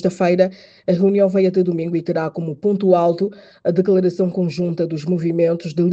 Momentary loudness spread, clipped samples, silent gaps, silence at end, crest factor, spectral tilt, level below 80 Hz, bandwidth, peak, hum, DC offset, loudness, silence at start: 7 LU; under 0.1%; none; 0 s; 16 dB; -8.5 dB/octave; -62 dBFS; 8 kHz; -2 dBFS; none; under 0.1%; -18 LUFS; 0 s